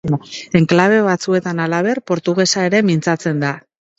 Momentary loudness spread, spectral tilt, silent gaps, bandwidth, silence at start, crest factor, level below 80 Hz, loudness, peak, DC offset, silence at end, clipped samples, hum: 9 LU; -5.5 dB/octave; none; 8 kHz; 0.05 s; 16 dB; -54 dBFS; -16 LUFS; 0 dBFS; under 0.1%; 0.4 s; under 0.1%; none